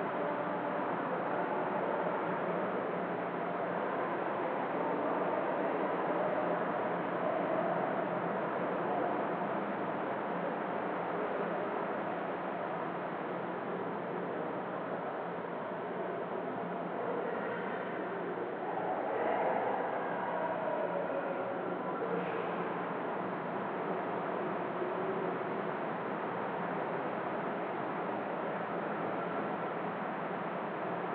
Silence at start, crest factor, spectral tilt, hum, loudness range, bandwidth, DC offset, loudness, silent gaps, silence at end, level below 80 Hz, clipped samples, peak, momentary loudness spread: 0 s; 14 dB; -5 dB/octave; none; 4 LU; 4.9 kHz; under 0.1%; -36 LUFS; none; 0 s; -84 dBFS; under 0.1%; -22 dBFS; 4 LU